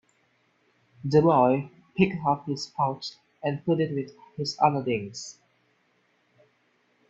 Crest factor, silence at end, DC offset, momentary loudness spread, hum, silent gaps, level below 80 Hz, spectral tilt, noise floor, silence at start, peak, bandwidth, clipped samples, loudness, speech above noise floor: 22 dB; 1.8 s; under 0.1%; 17 LU; none; none; -62 dBFS; -6.5 dB/octave; -68 dBFS; 1.05 s; -6 dBFS; 8 kHz; under 0.1%; -26 LUFS; 43 dB